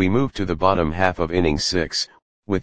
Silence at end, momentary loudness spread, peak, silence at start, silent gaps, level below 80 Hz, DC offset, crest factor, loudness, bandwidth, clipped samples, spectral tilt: 0 s; 6 LU; 0 dBFS; 0 s; 2.22-2.43 s; -38 dBFS; 2%; 20 dB; -21 LUFS; 10 kHz; under 0.1%; -5 dB/octave